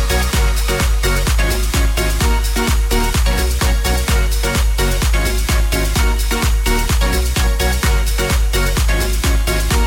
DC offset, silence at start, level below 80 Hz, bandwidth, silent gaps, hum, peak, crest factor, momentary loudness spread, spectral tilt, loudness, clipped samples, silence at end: under 0.1%; 0 s; -16 dBFS; 17.5 kHz; none; none; -2 dBFS; 12 dB; 1 LU; -4 dB/octave; -16 LUFS; under 0.1%; 0 s